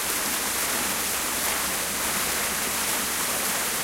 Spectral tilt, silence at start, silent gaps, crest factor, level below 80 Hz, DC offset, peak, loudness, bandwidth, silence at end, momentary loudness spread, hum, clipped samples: -0.5 dB/octave; 0 s; none; 14 dB; -50 dBFS; under 0.1%; -12 dBFS; -24 LUFS; 16 kHz; 0 s; 1 LU; none; under 0.1%